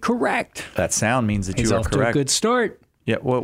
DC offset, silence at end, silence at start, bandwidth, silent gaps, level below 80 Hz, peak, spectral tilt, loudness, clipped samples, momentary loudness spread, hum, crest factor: under 0.1%; 0 s; 0 s; 16 kHz; none; -38 dBFS; -6 dBFS; -4 dB/octave; -21 LUFS; under 0.1%; 8 LU; none; 14 dB